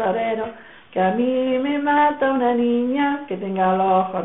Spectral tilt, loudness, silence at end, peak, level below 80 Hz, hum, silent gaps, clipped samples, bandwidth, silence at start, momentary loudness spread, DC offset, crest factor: -4.5 dB/octave; -20 LUFS; 0 s; -6 dBFS; -58 dBFS; none; none; under 0.1%; 4 kHz; 0 s; 9 LU; 0.2%; 14 dB